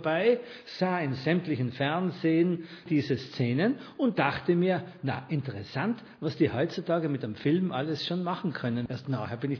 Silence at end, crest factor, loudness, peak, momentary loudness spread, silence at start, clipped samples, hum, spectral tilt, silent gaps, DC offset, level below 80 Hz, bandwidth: 0 s; 18 dB; -29 LUFS; -10 dBFS; 7 LU; 0 s; under 0.1%; none; -8 dB/octave; none; under 0.1%; -66 dBFS; 5.4 kHz